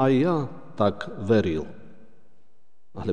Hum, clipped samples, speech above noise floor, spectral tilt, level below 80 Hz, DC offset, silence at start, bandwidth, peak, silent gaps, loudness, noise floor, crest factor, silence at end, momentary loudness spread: none; under 0.1%; 47 dB; -8 dB/octave; -54 dBFS; 1%; 0 s; 9.8 kHz; -8 dBFS; none; -25 LUFS; -70 dBFS; 18 dB; 0 s; 15 LU